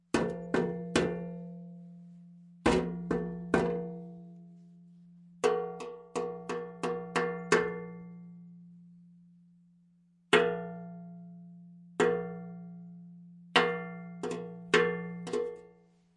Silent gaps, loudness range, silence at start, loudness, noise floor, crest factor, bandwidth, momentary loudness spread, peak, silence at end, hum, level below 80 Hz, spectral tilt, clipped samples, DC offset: none; 3 LU; 0.15 s; -32 LUFS; -66 dBFS; 26 dB; 11.5 kHz; 23 LU; -8 dBFS; 0.5 s; none; -60 dBFS; -5 dB/octave; under 0.1%; under 0.1%